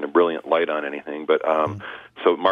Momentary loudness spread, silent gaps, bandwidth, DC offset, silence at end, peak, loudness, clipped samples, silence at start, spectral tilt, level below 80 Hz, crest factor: 10 LU; none; 6.4 kHz; under 0.1%; 0 s; -4 dBFS; -22 LUFS; under 0.1%; 0 s; -7 dB/octave; -68 dBFS; 18 dB